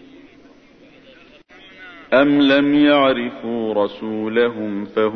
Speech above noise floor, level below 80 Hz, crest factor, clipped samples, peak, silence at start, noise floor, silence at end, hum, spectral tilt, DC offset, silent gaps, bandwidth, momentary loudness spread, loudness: 31 dB; -56 dBFS; 16 dB; under 0.1%; -4 dBFS; 1.8 s; -47 dBFS; 0 s; none; -7.5 dB/octave; under 0.1%; none; 5.8 kHz; 12 LU; -17 LUFS